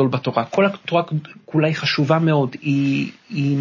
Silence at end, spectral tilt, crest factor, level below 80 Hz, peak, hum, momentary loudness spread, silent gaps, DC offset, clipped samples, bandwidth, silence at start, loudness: 0 s; -7 dB/octave; 18 dB; -66 dBFS; -2 dBFS; none; 7 LU; none; under 0.1%; under 0.1%; 7.4 kHz; 0 s; -20 LUFS